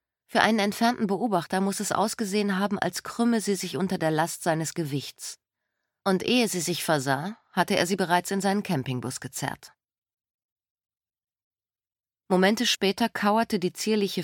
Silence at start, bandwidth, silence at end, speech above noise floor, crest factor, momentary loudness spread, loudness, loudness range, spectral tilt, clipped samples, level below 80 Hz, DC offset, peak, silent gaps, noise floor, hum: 0.3 s; 17.5 kHz; 0 s; over 64 dB; 24 dB; 9 LU; -26 LUFS; 7 LU; -4 dB/octave; under 0.1%; -68 dBFS; under 0.1%; -4 dBFS; 9.98-10.02 s, 10.13-10.17 s, 10.30-10.56 s, 10.70-10.76 s, 11.44-11.51 s; under -90 dBFS; none